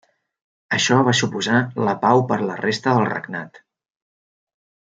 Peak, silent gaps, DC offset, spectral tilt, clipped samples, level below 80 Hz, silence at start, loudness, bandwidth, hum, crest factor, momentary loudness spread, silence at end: -2 dBFS; none; under 0.1%; -4.5 dB/octave; under 0.1%; -66 dBFS; 0.7 s; -19 LUFS; 9.4 kHz; none; 18 dB; 11 LU; 1.4 s